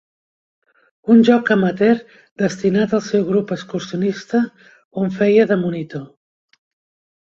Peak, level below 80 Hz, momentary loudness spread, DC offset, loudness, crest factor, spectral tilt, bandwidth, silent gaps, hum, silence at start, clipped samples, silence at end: -2 dBFS; -60 dBFS; 13 LU; under 0.1%; -17 LUFS; 16 dB; -7 dB/octave; 7.6 kHz; 2.31-2.36 s, 4.85-4.91 s; none; 1.05 s; under 0.1%; 1.2 s